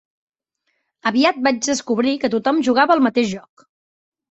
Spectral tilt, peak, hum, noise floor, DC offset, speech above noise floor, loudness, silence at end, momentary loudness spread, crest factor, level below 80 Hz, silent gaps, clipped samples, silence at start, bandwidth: -3.5 dB/octave; -2 dBFS; none; -72 dBFS; under 0.1%; 54 dB; -18 LUFS; 0.9 s; 7 LU; 18 dB; -62 dBFS; none; under 0.1%; 1.05 s; 8.2 kHz